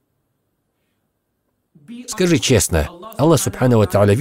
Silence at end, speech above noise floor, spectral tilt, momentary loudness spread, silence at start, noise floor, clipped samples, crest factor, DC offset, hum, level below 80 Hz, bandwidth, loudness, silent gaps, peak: 0 s; 55 dB; -5 dB/octave; 13 LU; 1.9 s; -70 dBFS; under 0.1%; 16 dB; under 0.1%; none; -36 dBFS; 16 kHz; -16 LUFS; none; -2 dBFS